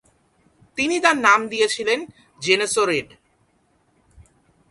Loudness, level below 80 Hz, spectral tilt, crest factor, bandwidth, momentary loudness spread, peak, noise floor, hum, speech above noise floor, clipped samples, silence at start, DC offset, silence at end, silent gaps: -19 LUFS; -60 dBFS; -2 dB/octave; 22 dB; 11.5 kHz; 11 LU; 0 dBFS; -63 dBFS; none; 44 dB; under 0.1%; 0.75 s; under 0.1%; 1.65 s; none